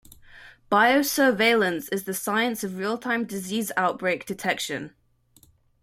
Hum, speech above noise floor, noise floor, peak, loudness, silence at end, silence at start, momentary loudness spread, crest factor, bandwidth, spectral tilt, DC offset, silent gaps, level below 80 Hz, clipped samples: none; 36 dB; -60 dBFS; -6 dBFS; -24 LUFS; 0.95 s; 0.3 s; 10 LU; 18 dB; 16.5 kHz; -3.5 dB/octave; under 0.1%; none; -64 dBFS; under 0.1%